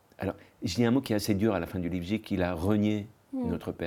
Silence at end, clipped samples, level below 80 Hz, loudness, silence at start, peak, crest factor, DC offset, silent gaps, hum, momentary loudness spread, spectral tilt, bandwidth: 0 s; under 0.1%; -58 dBFS; -30 LUFS; 0.2 s; -12 dBFS; 16 dB; under 0.1%; none; none; 10 LU; -6.5 dB/octave; 18 kHz